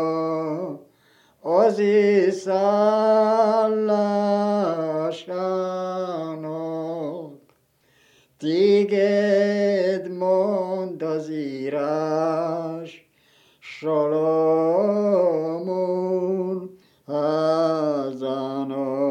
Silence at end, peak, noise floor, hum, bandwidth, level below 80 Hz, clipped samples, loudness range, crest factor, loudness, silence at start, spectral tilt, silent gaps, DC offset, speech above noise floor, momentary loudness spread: 0 s; -6 dBFS; -62 dBFS; none; 9.2 kHz; -80 dBFS; under 0.1%; 7 LU; 16 dB; -22 LUFS; 0 s; -7 dB/octave; none; under 0.1%; 43 dB; 12 LU